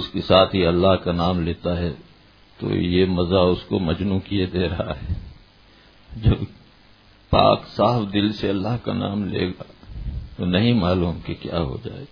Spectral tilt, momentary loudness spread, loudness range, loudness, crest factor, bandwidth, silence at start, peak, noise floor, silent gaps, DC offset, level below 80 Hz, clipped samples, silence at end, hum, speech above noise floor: -9 dB/octave; 15 LU; 4 LU; -21 LUFS; 22 dB; 5.4 kHz; 0 s; 0 dBFS; -51 dBFS; none; under 0.1%; -38 dBFS; under 0.1%; 0.05 s; none; 31 dB